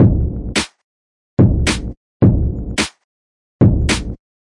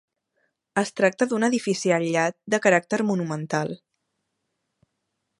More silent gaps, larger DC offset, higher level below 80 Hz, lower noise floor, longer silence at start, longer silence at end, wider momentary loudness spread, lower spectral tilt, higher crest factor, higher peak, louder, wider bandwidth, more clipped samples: first, 0.84-1.37 s, 1.97-2.20 s, 3.04-3.59 s vs none; neither; first, -24 dBFS vs -74 dBFS; first, under -90 dBFS vs -78 dBFS; second, 0 s vs 0.75 s; second, 0.3 s vs 1.65 s; about the same, 10 LU vs 8 LU; about the same, -5.5 dB/octave vs -5 dB/octave; second, 16 dB vs 22 dB; first, 0 dBFS vs -4 dBFS; first, -17 LUFS vs -23 LUFS; about the same, 11.5 kHz vs 11.5 kHz; neither